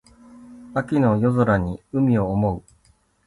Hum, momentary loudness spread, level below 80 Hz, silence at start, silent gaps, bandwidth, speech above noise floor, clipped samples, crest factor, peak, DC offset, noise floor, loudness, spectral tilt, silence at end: none; 9 LU; -44 dBFS; 0.35 s; none; 11.5 kHz; 40 dB; under 0.1%; 14 dB; -8 dBFS; under 0.1%; -60 dBFS; -21 LUFS; -9.5 dB/octave; 0.7 s